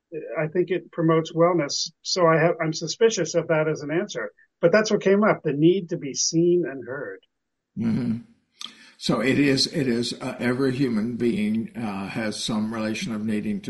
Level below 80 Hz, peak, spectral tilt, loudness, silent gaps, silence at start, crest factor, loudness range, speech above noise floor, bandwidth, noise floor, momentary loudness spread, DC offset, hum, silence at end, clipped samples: -60 dBFS; -6 dBFS; -5 dB/octave; -23 LUFS; none; 0.1 s; 18 dB; 4 LU; 20 dB; 11.5 kHz; -43 dBFS; 12 LU; under 0.1%; none; 0 s; under 0.1%